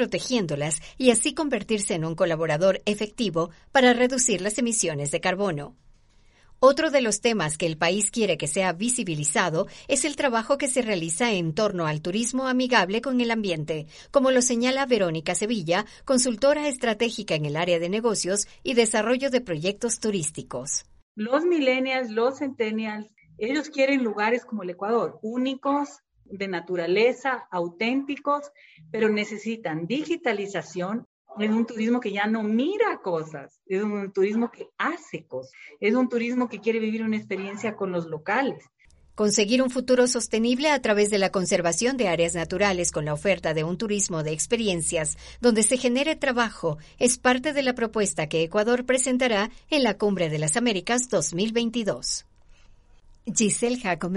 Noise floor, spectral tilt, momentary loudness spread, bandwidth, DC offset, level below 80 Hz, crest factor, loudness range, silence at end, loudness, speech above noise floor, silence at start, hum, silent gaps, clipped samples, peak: -57 dBFS; -3.5 dB/octave; 9 LU; 11.5 kHz; under 0.1%; -54 dBFS; 20 dB; 4 LU; 0 s; -24 LUFS; 32 dB; 0 s; none; 21.02-21.15 s, 31.06-31.25 s; under 0.1%; -4 dBFS